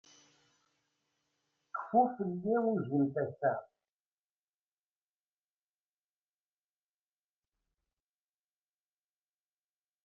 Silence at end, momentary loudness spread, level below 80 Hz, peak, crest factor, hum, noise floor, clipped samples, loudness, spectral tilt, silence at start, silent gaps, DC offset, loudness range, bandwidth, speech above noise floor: 6.4 s; 12 LU; -84 dBFS; -16 dBFS; 24 dB; 50 Hz at -75 dBFS; under -90 dBFS; under 0.1%; -33 LUFS; -9 dB/octave; 1.75 s; none; under 0.1%; 8 LU; 6.8 kHz; over 58 dB